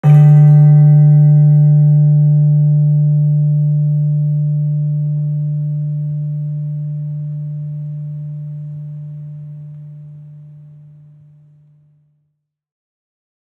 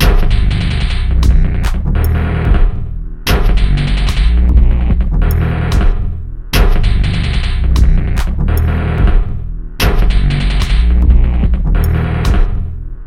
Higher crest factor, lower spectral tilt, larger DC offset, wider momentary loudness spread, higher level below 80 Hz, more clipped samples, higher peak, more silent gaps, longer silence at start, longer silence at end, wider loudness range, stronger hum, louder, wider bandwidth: about the same, 12 dB vs 10 dB; first, -12.5 dB/octave vs -6.5 dB/octave; neither; first, 21 LU vs 6 LU; second, -64 dBFS vs -12 dBFS; neither; about the same, -2 dBFS vs 0 dBFS; neither; about the same, 0.05 s vs 0 s; first, 2.95 s vs 0 s; first, 21 LU vs 1 LU; neither; about the same, -12 LUFS vs -14 LUFS; second, 2.1 kHz vs 15.5 kHz